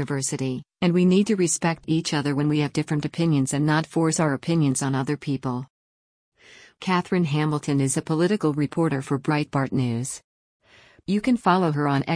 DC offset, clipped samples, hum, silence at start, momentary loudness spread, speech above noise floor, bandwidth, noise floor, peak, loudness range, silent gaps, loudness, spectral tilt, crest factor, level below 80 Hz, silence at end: under 0.1%; under 0.1%; none; 0 s; 7 LU; over 67 dB; 10.5 kHz; under -90 dBFS; -8 dBFS; 3 LU; 5.70-6.32 s, 10.24-10.60 s; -23 LUFS; -5.5 dB/octave; 16 dB; -60 dBFS; 0 s